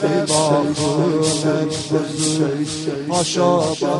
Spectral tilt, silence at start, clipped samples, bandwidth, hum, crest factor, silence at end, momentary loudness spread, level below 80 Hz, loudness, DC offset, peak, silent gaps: -4.5 dB/octave; 0 s; under 0.1%; 11.5 kHz; none; 16 dB; 0 s; 5 LU; -54 dBFS; -18 LUFS; under 0.1%; -2 dBFS; none